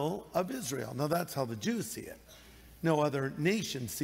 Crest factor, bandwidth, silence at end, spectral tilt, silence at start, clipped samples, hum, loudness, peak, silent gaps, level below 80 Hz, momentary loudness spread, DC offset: 18 dB; 16 kHz; 0 s; -5 dB/octave; 0 s; under 0.1%; none; -34 LUFS; -16 dBFS; none; -64 dBFS; 16 LU; under 0.1%